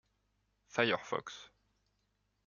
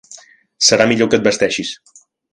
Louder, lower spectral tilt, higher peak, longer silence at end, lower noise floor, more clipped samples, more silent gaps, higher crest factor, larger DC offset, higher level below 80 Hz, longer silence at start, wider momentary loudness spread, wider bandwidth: second, -35 LUFS vs -14 LUFS; first, -4 dB/octave vs -2.5 dB/octave; second, -14 dBFS vs 0 dBFS; first, 1 s vs 0.6 s; first, -80 dBFS vs -42 dBFS; neither; neither; first, 28 dB vs 16 dB; neither; second, -78 dBFS vs -54 dBFS; first, 0.75 s vs 0.1 s; first, 17 LU vs 14 LU; second, 7.4 kHz vs 11 kHz